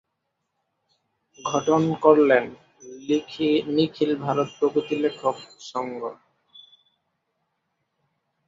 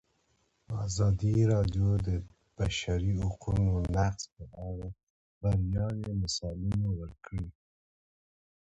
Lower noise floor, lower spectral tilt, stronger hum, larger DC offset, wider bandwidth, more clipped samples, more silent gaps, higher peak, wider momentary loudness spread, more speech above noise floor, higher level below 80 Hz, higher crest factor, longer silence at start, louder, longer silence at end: first, -78 dBFS vs -73 dBFS; about the same, -5.5 dB/octave vs -6.5 dB/octave; neither; neither; about the same, 7.6 kHz vs 8.2 kHz; neither; second, none vs 5.03-5.41 s; first, -4 dBFS vs -16 dBFS; first, 17 LU vs 14 LU; first, 56 dB vs 43 dB; second, -68 dBFS vs -42 dBFS; first, 22 dB vs 16 dB; first, 1.4 s vs 0.7 s; first, -23 LUFS vs -32 LUFS; first, 2.35 s vs 1.1 s